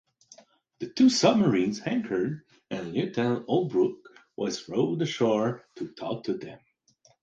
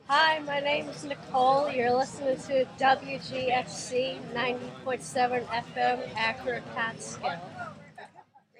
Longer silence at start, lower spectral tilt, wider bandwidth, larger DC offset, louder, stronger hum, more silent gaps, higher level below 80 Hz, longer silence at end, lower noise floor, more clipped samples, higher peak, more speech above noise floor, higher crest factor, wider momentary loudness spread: first, 0.8 s vs 0.05 s; first, -5.5 dB/octave vs -3.5 dB/octave; second, 9 kHz vs 11 kHz; neither; about the same, -27 LUFS vs -29 LUFS; neither; neither; about the same, -68 dBFS vs -68 dBFS; first, 0.65 s vs 0.4 s; first, -64 dBFS vs -57 dBFS; neither; first, -6 dBFS vs -12 dBFS; first, 38 dB vs 28 dB; about the same, 20 dB vs 18 dB; first, 17 LU vs 13 LU